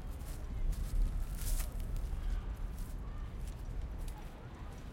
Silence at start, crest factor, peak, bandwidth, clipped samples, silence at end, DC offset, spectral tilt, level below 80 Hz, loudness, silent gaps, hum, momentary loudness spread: 0 s; 16 dB; -22 dBFS; 16.5 kHz; under 0.1%; 0 s; under 0.1%; -5 dB/octave; -38 dBFS; -43 LUFS; none; none; 9 LU